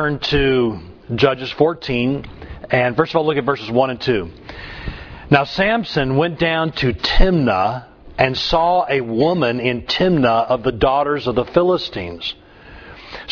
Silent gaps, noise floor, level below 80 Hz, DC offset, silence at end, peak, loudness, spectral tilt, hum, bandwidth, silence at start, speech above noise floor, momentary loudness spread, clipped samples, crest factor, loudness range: none; -40 dBFS; -28 dBFS; under 0.1%; 0 s; 0 dBFS; -18 LUFS; -7 dB/octave; none; 5.4 kHz; 0 s; 23 dB; 16 LU; under 0.1%; 18 dB; 2 LU